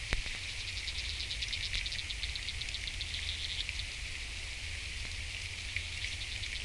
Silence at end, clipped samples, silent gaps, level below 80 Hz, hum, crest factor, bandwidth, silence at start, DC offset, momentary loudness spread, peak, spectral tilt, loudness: 0 s; under 0.1%; none; -44 dBFS; none; 30 dB; 11.5 kHz; 0 s; under 0.1%; 4 LU; -10 dBFS; -1.5 dB/octave; -37 LUFS